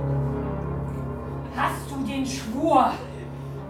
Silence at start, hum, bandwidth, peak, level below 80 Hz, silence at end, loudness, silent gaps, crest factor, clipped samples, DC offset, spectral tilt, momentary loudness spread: 0 s; none; 15 kHz; -6 dBFS; -40 dBFS; 0 s; -27 LUFS; none; 20 dB; under 0.1%; under 0.1%; -6.5 dB/octave; 13 LU